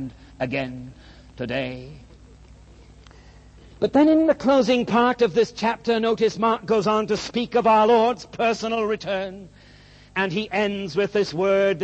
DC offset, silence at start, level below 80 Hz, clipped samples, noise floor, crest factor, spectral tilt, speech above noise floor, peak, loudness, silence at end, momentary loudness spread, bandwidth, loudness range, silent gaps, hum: under 0.1%; 0 s; -52 dBFS; under 0.1%; -49 dBFS; 16 dB; -5.5 dB/octave; 28 dB; -6 dBFS; -21 LUFS; 0 s; 14 LU; 8.4 kHz; 12 LU; none; 50 Hz at -55 dBFS